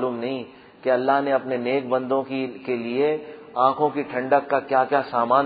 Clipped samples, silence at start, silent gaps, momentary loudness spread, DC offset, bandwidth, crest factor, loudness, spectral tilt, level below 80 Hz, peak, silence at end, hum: under 0.1%; 0 s; none; 9 LU; under 0.1%; 5 kHz; 18 dB; -23 LUFS; -9.5 dB/octave; -72 dBFS; -4 dBFS; 0 s; none